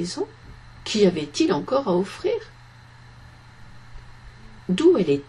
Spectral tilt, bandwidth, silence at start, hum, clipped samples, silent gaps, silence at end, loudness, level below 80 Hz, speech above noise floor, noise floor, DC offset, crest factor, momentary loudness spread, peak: -5.5 dB/octave; 11 kHz; 0 s; none; under 0.1%; none; 0.05 s; -22 LUFS; -50 dBFS; 26 dB; -47 dBFS; under 0.1%; 18 dB; 16 LU; -6 dBFS